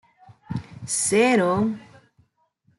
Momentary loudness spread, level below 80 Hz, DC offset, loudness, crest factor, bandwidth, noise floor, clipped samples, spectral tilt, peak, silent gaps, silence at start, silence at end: 16 LU; -60 dBFS; under 0.1%; -22 LUFS; 18 dB; 12 kHz; -66 dBFS; under 0.1%; -4 dB/octave; -6 dBFS; none; 0.5 s; 0.95 s